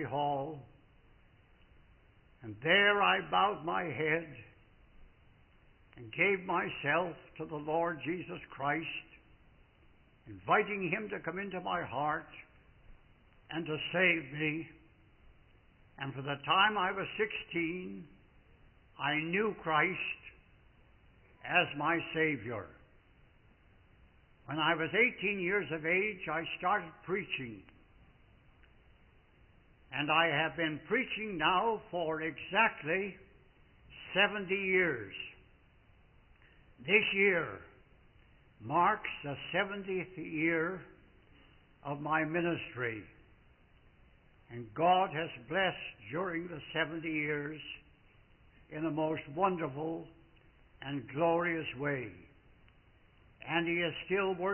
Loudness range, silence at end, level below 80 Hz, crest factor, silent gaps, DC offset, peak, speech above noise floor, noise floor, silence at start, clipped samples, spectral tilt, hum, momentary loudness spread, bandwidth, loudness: 6 LU; 0 s; -66 dBFS; 24 dB; none; under 0.1%; -12 dBFS; 30 dB; -64 dBFS; 0 s; under 0.1%; -0.5 dB/octave; none; 17 LU; 3.2 kHz; -33 LUFS